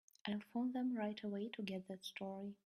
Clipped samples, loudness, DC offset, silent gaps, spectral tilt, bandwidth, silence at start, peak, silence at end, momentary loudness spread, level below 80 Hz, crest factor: under 0.1%; -44 LUFS; under 0.1%; none; -6 dB/octave; 14 kHz; 0.25 s; -26 dBFS; 0.1 s; 7 LU; -86 dBFS; 18 dB